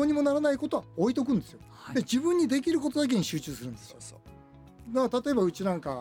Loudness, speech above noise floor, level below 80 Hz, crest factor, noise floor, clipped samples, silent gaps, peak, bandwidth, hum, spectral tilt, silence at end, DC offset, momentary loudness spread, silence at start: -28 LUFS; 24 dB; -60 dBFS; 14 dB; -52 dBFS; under 0.1%; none; -14 dBFS; 17.5 kHz; none; -5.5 dB/octave; 0 s; under 0.1%; 18 LU; 0 s